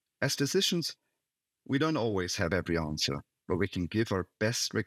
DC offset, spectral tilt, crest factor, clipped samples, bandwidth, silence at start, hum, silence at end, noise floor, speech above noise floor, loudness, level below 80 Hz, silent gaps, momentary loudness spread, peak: under 0.1%; -4 dB/octave; 18 dB; under 0.1%; 16.5 kHz; 0.2 s; none; 0 s; -88 dBFS; 57 dB; -31 LUFS; -58 dBFS; none; 6 LU; -14 dBFS